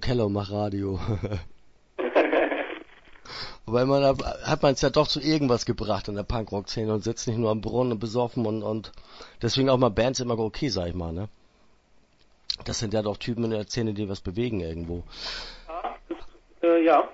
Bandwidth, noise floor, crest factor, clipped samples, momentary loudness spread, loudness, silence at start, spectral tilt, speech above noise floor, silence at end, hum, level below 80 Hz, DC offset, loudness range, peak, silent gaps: 8 kHz; -60 dBFS; 20 dB; under 0.1%; 15 LU; -26 LUFS; 0 s; -5.5 dB/octave; 34 dB; 0 s; none; -44 dBFS; under 0.1%; 6 LU; -6 dBFS; none